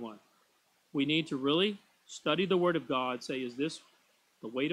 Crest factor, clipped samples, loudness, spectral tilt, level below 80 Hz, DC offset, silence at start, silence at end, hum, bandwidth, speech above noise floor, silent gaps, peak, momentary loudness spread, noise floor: 18 dB; under 0.1%; -32 LUFS; -5 dB/octave; -76 dBFS; under 0.1%; 0 s; 0 s; none; 12 kHz; 40 dB; none; -14 dBFS; 18 LU; -71 dBFS